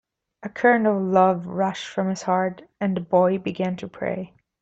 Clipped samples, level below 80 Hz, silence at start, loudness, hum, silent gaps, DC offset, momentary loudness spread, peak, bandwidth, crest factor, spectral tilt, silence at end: under 0.1%; -64 dBFS; 0.45 s; -23 LUFS; none; none; under 0.1%; 11 LU; -4 dBFS; 8 kHz; 18 dB; -6.5 dB/octave; 0.35 s